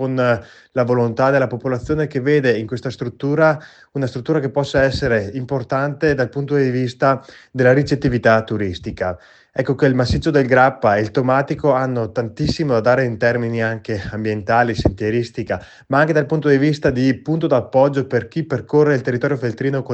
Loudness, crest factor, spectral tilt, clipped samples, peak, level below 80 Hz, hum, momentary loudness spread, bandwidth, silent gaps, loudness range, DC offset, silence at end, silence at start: -18 LUFS; 16 dB; -7.5 dB/octave; under 0.1%; 0 dBFS; -42 dBFS; none; 9 LU; 8.6 kHz; none; 2 LU; under 0.1%; 0 s; 0 s